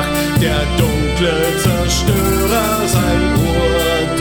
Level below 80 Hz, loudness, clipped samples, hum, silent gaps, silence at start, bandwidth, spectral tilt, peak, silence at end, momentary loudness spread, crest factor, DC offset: -24 dBFS; -15 LUFS; under 0.1%; none; none; 0 s; over 20 kHz; -5 dB/octave; -2 dBFS; 0 s; 1 LU; 12 dB; under 0.1%